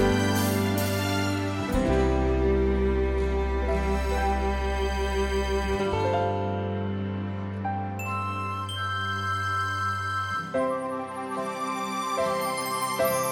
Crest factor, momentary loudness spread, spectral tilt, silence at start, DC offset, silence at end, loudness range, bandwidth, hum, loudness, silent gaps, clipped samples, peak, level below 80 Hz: 16 dB; 6 LU; -5.5 dB/octave; 0 s; under 0.1%; 0 s; 4 LU; 16.5 kHz; none; -27 LUFS; none; under 0.1%; -10 dBFS; -34 dBFS